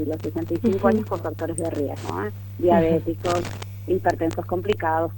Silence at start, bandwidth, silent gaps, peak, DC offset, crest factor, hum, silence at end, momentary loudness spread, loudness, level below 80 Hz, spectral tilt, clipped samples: 0 s; 19 kHz; none; -4 dBFS; under 0.1%; 20 dB; 50 Hz at -35 dBFS; 0 s; 9 LU; -24 LUFS; -48 dBFS; -6.5 dB/octave; under 0.1%